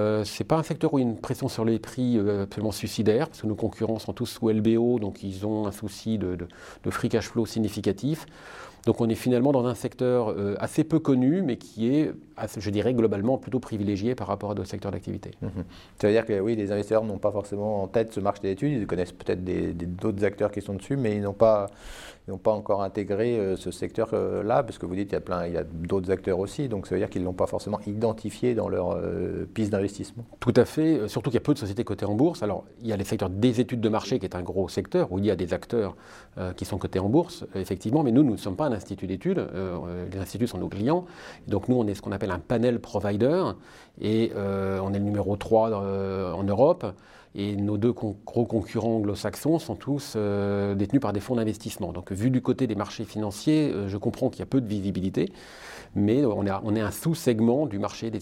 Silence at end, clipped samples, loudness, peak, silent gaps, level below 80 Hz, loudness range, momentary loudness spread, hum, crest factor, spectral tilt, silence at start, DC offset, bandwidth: 0 s; under 0.1%; -27 LUFS; -6 dBFS; none; -54 dBFS; 3 LU; 10 LU; none; 20 dB; -7 dB/octave; 0 s; under 0.1%; 16.5 kHz